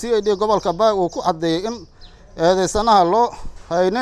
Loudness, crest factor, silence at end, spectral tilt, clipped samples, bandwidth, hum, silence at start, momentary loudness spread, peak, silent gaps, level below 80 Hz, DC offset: -18 LUFS; 16 dB; 0 s; -5 dB/octave; under 0.1%; 13 kHz; none; 0 s; 10 LU; -2 dBFS; none; -40 dBFS; under 0.1%